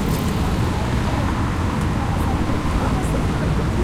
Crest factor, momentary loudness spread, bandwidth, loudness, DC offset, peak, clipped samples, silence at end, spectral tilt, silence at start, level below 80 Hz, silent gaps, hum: 12 dB; 1 LU; 16 kHz; -21 LUFS; under 0.1%; -8 dBFS; under 0.1%; 0 s; -6.5 dB/octave; 0 s; -26 dBFS; none; none